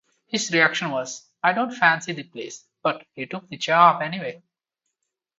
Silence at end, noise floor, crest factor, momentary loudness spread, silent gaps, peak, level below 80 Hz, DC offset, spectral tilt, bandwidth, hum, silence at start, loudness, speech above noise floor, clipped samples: 1 s; -81 dBFS; 22 dB; 18 LU; none; -2 dBFS; -74 dBFS; under 0.1%; -3.5 dB/octave; 8 kHz; none; 0.3 s; -21 LUFS; 59 dB; under 0.1%